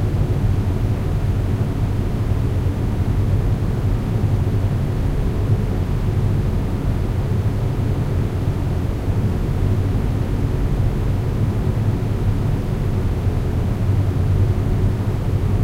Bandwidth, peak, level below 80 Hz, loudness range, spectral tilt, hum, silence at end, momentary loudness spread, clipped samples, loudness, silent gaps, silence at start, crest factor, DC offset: 15 kHz; -6 dBFS; -24 dBFS; 1 LU; -8.5 dB/octave; none; 0 s; 2 LU; under 0.1%; -21 LUFS; none; 0 s; 12 dB; under 0.1%